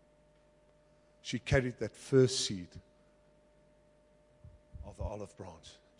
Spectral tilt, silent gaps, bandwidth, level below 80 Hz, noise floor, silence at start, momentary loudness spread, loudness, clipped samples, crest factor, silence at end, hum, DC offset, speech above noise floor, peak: -5 dB/octave; none; 11.5 kHz; -54 dBFS; -66 dBFS; 1.25 s; 24 LU; -33 LUFS; under 0.1%; 22 dB; 0.3 s; none; under 0.1%; 33 dB; -14 dBFS